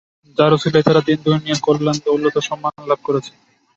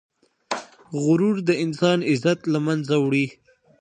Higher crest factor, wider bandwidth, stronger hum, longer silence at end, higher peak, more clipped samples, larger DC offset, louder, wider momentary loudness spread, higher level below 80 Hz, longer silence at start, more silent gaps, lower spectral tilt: about the same, 16 dB vs 16 dB; second, 8 kHz vs 9.8 kHz; neither; about the same, 0.5 s vs 0.5 s; first, 0 dBFS vs -6 dBFS; neither; neither; first, -17 LUFS vs -22 LUFS; second, 9 LU vs 12 LU; first, -58 dBFS vs -68 dBFS; about the same, 0.4 s vs 0.5 s; neither; about the same, -6 dB/octave vs -6 dB/octave